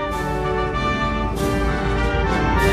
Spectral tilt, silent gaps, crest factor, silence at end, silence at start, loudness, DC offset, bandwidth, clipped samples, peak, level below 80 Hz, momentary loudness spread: -6 dB/octave; none; 16 dB; 0 s; 0 s; -21 LUFS; under 0.1%; 15 kHz; under 0.1%; -4 dBFS; -26 dBFS; 3 LU